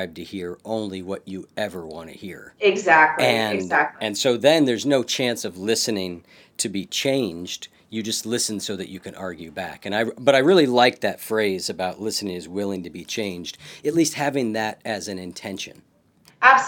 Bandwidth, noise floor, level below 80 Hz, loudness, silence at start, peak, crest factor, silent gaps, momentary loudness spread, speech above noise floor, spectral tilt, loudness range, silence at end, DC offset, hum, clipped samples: 19.5 kHz; -57 dBFS; -66 dBFS; -22 LUFS; 0 s; 0 dBFS; 22 dB; none; 17 LU; 34 dB; -3.5 dB/octave; 7 LU; 0 s; under 0.1%; none; under 0.1%